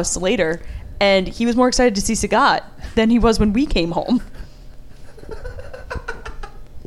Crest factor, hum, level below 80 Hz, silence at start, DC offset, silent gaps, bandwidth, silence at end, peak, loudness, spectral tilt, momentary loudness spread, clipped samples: 18 dB; none; -30 dBFS; 0 s; under 0.1%; none; 13.5 kHz; 0.05 s; -2 dBFS; -18 LUFS; -4 dB/octave; 20 LU; under 0.1%